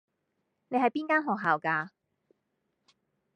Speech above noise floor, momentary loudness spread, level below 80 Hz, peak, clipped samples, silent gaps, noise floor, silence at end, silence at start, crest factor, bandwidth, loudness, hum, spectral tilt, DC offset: 52 dB; 6 LU; -86 dBFS; -12 dBFS; under 0.1%; none; -80 dBFS; 1.45 s; 0.7 s; 22 dB; 9.2 kHz; -28 LUFS; none; -7 dB/octave; under 0.1%